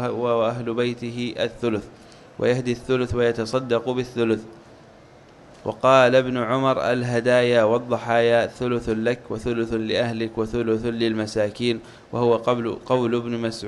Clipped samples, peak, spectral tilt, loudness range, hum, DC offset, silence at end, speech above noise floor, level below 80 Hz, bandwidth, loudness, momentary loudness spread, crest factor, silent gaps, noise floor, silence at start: under 0.1%; -2 dBFS; -6 dB/octave; 5 LU; none; under 0.1%; 0 s; 27 dB; -50 dBFS; 11.5 kHz; -22 LUFS; 9 LU; 20 dB; none; -48 dBFS; 0 s